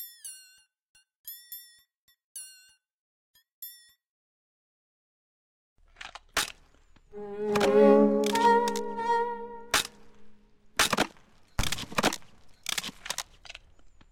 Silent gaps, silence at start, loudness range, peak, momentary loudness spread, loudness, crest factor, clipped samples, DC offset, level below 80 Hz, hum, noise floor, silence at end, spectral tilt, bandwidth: 0.89-0.95 s, 1.16-1.24 s, 1.97-2.08 s, 2.24-2.35 s, 2.93-3.34 s, 3.52-3.62 s, 4.09-5.76 s; 0 s; 22 LU; -6 dBFS; 23 LU; -27 LUFS; 24 dB; under 0.1%; under 0.1%; -52 dBFS; none; -60 dBFS; 0.25 s; -3.5 dB/octave; 17 kHz